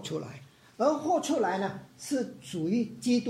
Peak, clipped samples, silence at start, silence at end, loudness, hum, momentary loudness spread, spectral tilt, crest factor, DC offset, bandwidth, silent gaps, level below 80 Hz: -14 dBFS; under 0.1%; 0 s; 0 s; -30 LUFS; none; 12 LU; -5 dB/octave; 16 dB; under 0.1%; 15.5 kHz; none; -72 dBFS